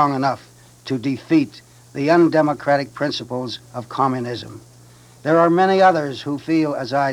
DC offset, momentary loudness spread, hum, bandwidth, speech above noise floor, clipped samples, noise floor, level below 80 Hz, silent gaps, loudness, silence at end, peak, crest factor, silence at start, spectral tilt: under 0.1%; 15 LU; none; 12 kHz; 28 dB; under 0.1%; -46 dBFS; -62 dBFS; none; -19 LUFS; 0 s; -2 dBFS; 16 dB; 0 s; -6.5 dB/octave